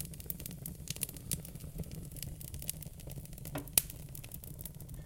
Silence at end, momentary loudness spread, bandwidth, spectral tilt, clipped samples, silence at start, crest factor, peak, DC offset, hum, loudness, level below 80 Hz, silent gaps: 0 s; 15 LU; 17 kHz; -3 dB/octave; under 0.1%; 0 s; 38 dB; -4 dBFS; under 0.1%; none; -39 LUFS; -52 dBFS; none